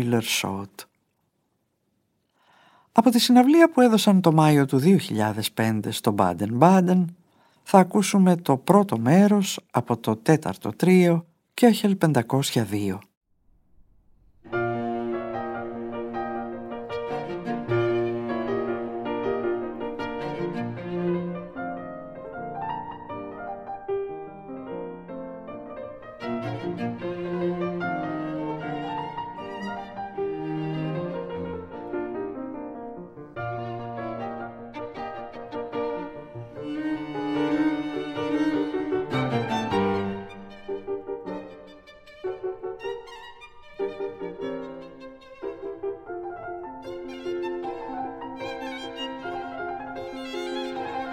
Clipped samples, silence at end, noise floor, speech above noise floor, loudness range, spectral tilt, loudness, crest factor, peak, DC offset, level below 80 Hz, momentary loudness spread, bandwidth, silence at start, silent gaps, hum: under 0.1%; 0 s; -73 dBFS; 53 dB; 15 LU; -6 dB/octave; -25 LUFS; 24 dB; 0 dBFS; under 0.1%; -58 dBFS; 19 LU; 16.5 kHz; 0 s; 13.17-13.21 s; none